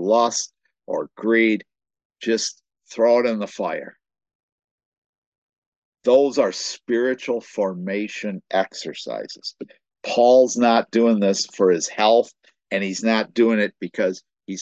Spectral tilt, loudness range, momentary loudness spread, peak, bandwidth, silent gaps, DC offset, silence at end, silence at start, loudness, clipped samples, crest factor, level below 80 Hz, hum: -4 dB/octave; 7 LU; 14 LU; -4 dBFS; 8.6 kHz; 2.05-2.10 s, 4.35-4.58 s, 4.64-4.78 s, 4.85-4.92 s, 4.98-5.32 s, 5.38-5.92 s; under 0.1%; 0 s; 0 s; -21 LUFS; under 0.1%; 18 dB; -74 dBFS; none